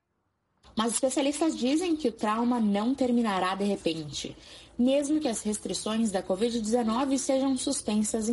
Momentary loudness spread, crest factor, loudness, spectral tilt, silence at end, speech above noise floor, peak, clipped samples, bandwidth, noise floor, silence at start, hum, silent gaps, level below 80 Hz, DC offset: 5 LU; 14 dB; -28 LUFS; -4 dB/octave; 0 s; 50 dB; -14 dBFS; under 0.1%; 11.5 kHz; -77 dBFS; 0.75 s; none; none; -58 dBFS; under 0.1%